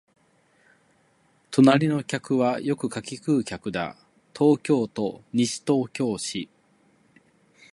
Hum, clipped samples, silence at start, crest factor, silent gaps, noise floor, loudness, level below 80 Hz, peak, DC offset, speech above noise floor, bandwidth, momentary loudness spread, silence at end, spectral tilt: none; under 0.1%; 1.5 s; 22 dB; none; -64 dBFS; -24 LUFS; -64 dBFS; -4 dBFS; under 0.1%; 40 dB; 11.5 kHz; 13 LU; 1.3 s; -5.5 dB/octave